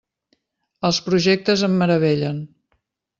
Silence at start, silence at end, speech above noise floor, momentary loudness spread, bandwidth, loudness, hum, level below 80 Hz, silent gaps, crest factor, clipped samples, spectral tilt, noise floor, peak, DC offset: 0.8 s; 0.75 s; 52 dB; 10 LU; 7.6 kHz; -19 LUFS; none; -58 dBFS; none; 18 dB; under 0.1%; -5.5 dB/octave; -70 dBFS; -4 dBFS; under 0.1%